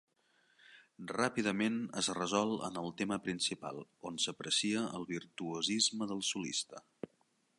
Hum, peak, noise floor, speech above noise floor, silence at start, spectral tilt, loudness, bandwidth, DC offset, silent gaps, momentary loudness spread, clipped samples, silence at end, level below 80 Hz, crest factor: none; -16 dBFS; -76 dBFS; 39 dB; 0.7 s; -3 dB/octave; -36 LUFS; 11.5 kHz; under 0.1%; none; 14 LU; under 0.1%; 0.55 s; -76 dBFS; 22 dB